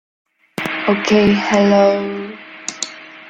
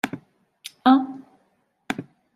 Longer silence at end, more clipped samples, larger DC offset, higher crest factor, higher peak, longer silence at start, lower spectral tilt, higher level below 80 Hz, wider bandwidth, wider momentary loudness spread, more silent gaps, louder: second, 0 s vs 0.35 s; neither; neither; about the same, 16 dB vs 20 dB; about the same, -2 dBFS vs -4 dBFS; first, 0.6 s vs 0.05 s; about the same, -5 dB/octave vs -5 dB/octave; first, -50 dBFS vs -70 dBFS; second, 9.6 kHz vs 14 kHz; second, 16 LU vs 23 LU; neither; first, -16 LUFS vs -23 LUFS